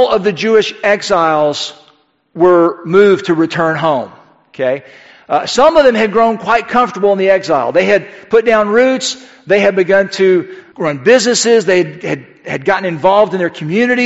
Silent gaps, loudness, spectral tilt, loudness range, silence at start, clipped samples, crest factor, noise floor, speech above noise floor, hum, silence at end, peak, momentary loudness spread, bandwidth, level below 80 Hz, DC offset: none; -12 LUFS; -4.5 dB/octave; 2 LU; 0 s; 0.1%; 12 dB; -52 dBFS; 40 dB; none; 0 s; 0 dBFS; 10 LU; 8.2 kHz; -50 dBFS; 0.2%